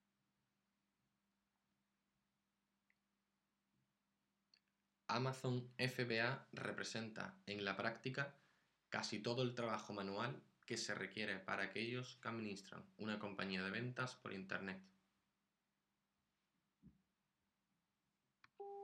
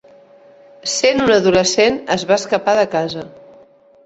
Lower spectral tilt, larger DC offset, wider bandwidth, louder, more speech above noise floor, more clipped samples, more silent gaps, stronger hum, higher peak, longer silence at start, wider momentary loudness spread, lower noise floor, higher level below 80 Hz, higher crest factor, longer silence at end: about the same, -4.5 dB/octave vs -3.5 dB/octave; neither; first, 11.5 kHz vs 8.2 kHz; second, -46 LUFS vs -15 LUFS; first, 44 dB vs 32 dB; neither; neither; neither; second, -24 dBFS vs 0 dBFS; first, 5.1 s vs 0.85 s; second, 9 LU vs 13 LU; first, -90 dBFS vs -47 dBFS; second, under -90 dBFS vs -50 dBFS; first, 26 dB vs 16 dB; second, 0 s vs 0.75 s